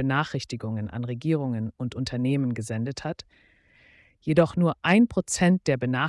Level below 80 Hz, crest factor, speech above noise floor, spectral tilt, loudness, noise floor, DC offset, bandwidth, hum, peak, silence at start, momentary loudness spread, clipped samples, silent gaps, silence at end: -56 dBFS; 18 dB; 33 dB; -6 dB/octave; -25 LUFS; -58 dBFS; under 0.1%; 12 kHz; none; -8 dBFS; 0 s; 11 LU; under 0.1%; none; 0 s